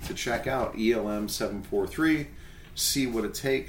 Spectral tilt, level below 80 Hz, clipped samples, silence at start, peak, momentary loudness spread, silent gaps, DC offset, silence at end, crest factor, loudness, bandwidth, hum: -3.5 dB/octave; -46 dBFS; under 0.1%; 0 s; -12 dBFS; 5 LU; none; under 0.1%; 0 s; 16 dB; -28 LUFS; 17 kHz; none